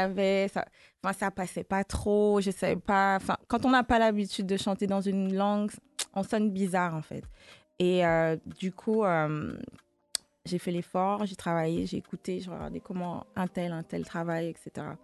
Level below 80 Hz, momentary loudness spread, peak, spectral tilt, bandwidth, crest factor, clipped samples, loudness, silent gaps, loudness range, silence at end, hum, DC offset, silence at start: -52 dBFS; 12 LU; -6 dBFS; -5.5 dB/octave; 12.5 kHz; 24 dB; under 0.1%; -30 LUFS; none; 6 LU; 0.05 s; none; under 0.1%; 0 s